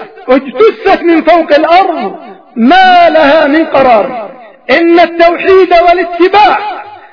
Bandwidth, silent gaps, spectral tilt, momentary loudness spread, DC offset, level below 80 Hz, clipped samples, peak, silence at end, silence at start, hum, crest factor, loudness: 5.4 kHz; none; -5.5 dB/octave; 12 LU; under 0.1%; -40 dBFS; 5%; 0 dBFS; 0.2 s; 0 s; none; 6 dB; -6 LUFS